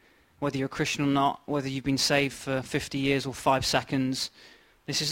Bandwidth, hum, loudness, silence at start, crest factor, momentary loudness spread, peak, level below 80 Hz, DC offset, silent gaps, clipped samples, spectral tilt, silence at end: 16.5 kHz; none; -28 LUFS; 0.4 s; 20 dB; 8 LU; -8 dBFS; -54 dBFS; under 0.1%; none; under 0.1%; -4 dB/octave; 0 s